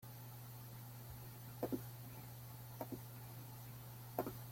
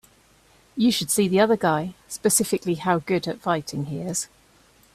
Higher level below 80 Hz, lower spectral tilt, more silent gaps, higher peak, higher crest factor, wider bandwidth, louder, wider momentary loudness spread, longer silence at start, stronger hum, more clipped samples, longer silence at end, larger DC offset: second, -70 dBFS vs -60 dBFS; first, -6 dB/octave vs -4 dB/octave; neither; second, -22 dBFS vs -6 dBFS; first, 28 dB vs 18 dB; about the same, 16.5 kHz vs 16 kHz; second, -50 LUFS vs -23 LUFS; second, 8 LU vs 11 LU; second, 0 s vs 0.75 s; neither; neither; second, 0 s vs 0.7 s; neither